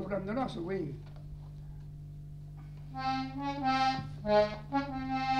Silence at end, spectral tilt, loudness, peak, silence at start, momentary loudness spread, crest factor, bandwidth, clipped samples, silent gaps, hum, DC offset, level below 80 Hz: 0 s; -6.5 dB/octave; -33 LUFS; -16 dBFS; 0 s; 18 LU; 20 dB; 10.5 kHz; under 0.1%; none; 50 Hz at -55 dBFS; under 0.1%; -52 dBFS